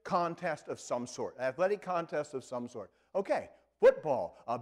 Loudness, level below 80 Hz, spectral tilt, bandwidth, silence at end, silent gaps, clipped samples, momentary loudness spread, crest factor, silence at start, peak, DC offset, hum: -33 LUFS; -72 dBFS; -5 dB/octave; 11 kHz; 0 s; none; under 0.1%; 14 LU; 18 dB; 0.05 s; -14 dBFS; under 0.1%; none